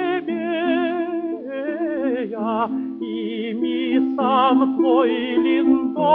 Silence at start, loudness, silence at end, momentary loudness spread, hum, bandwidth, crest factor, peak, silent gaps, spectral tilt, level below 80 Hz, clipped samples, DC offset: 0 s; -21 LUFS; 0 s; 9 LU; none; 4.2 kHz; 16 dB; -4 dBFS; none; -9 dB/octave; -64 dBFS; under 0.1%; under 0.1%